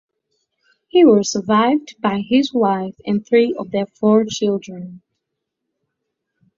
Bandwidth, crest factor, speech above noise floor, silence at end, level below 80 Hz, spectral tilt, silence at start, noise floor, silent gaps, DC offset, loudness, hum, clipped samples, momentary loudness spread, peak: 7.6 kHz; 16 dB; 62 dB; 1.6 s; -60 dBFS; -5.5 dB/octave; 0.95 s; -78 dBFS; none; under 0.1%; -17 LUFS; none; under 0.1%; 11 LU; -2 dBFS